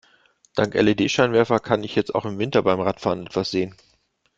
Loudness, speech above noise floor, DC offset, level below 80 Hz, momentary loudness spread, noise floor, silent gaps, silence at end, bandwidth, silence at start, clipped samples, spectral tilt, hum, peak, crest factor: -22 LUFS; 44 dB; under 0.1%; -56 dBFS; 8 LU; -65 dBFS; none; 0.65 s; 7.8 kHz; 0.55 s; under 0.1%; -5.5 dB/octave; none; -2 dBFS; 20 dB